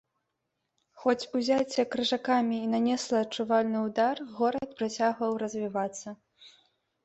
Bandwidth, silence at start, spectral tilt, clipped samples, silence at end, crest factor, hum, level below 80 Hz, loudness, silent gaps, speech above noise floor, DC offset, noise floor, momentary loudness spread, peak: 8.2 kHz; 0.95 s; -4 dB/octave; under 0.1%; 0.55 s; 18 dB; none; -72 dBFS; -29 LUFS; none; 53 dB; under 0.1%; -82 dBFS; 6 LU; -12 dBFS